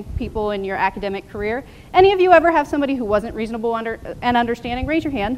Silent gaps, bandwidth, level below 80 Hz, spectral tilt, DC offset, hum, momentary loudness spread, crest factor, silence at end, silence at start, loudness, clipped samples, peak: none; 13 kHz; -38 dBFS; -6.5 dB/octave; 0.1%; none; 13 LU; 18 dB; 0 s; 0 s; -19 LUFS; under 0.1%; 0 dBFS